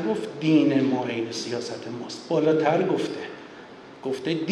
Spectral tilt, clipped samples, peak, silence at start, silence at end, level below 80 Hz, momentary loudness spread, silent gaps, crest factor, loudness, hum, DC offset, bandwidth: -6 dB/octave; under 0.1%; -8 dBFS; 0 s; 0 s; -74 dBFS; 17 LU; none; 16 dB; -25 LUFS; none; under 0.1%; 10.5 kHz